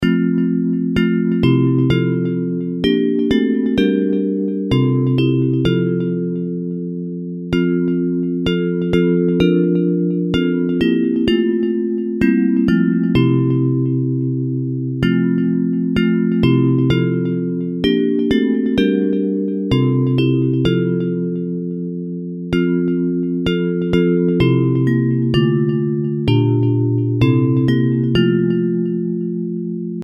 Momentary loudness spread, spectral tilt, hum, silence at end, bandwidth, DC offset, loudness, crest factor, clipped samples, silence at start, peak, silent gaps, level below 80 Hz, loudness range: 6 LU; -9 dB/octave; none; 0 s; 6.6 kHz; under 0.1%; -17 LUFS; 14 dB; under 0.1%; 0 s; -2 dBFS; none; -42 dBFS; 3 LU